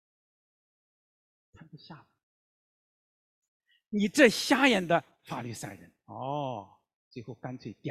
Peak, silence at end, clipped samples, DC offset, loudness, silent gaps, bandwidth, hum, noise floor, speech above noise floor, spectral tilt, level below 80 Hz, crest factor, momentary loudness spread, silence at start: -6 dBFS; 0 s; under 0.1%; under 0.1%; -27 LUFS; 2.23-3.42 s, 3.48-3.60 s, 6.96-7.11 s; 16 kHz; none; under -90 dBFS; over 61 dB; -4 dB/octave; -70 dBFS; 26 dB; 23 LU; 1.75 s